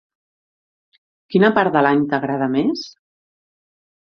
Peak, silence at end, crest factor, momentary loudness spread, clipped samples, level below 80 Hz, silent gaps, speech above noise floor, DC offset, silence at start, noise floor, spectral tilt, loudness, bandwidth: 0 dBFS; 1.25 s; 20 dB; 9 LU; under 0.1%; -62 dBFS; none; over 73 dB; under 0.1%; 1.3 s; under -90 dBFS; -7 dB/octave; -18 LUFS; 6.6 kHz